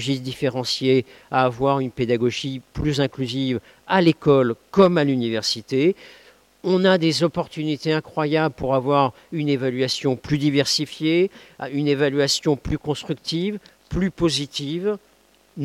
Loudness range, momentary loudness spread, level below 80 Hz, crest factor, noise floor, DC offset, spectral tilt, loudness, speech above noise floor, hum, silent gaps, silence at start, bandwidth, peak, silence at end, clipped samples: 3 LU; 9 LU; -48 dBFS; 18 dB; -48 dBFS; under 0.1%; -5.5 dB/octave; -21 LUFS; 27 dB; none; none; 0 s; 15.5 kHz; -4 dBFS; 0 s; under 0.1%